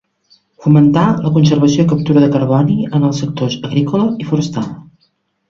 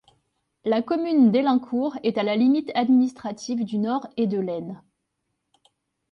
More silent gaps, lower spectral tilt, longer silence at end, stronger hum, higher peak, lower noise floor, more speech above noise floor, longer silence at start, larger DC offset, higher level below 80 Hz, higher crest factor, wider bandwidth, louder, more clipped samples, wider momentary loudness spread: neither; about the same, -7.5 dB/octave vs -6.5 dB/octave; second, 0.65 s vs 1.35 s; neither; first, 0 dBFS vs -8 dBFS; second, -61 dBFS vs -78 dBFS; second, 49 dB vs 55 dB; about the same, 0.6 s vs 0.65 s; neither; first, -48 dBFS vs -70 dBFS; about the same, 14 dB vs 16 dB; about the same, 7.2 kHz vs 7.2 kHz; first, -13 LUFS vs -23 LUFS; neither; second, 9 LU vs 13 LU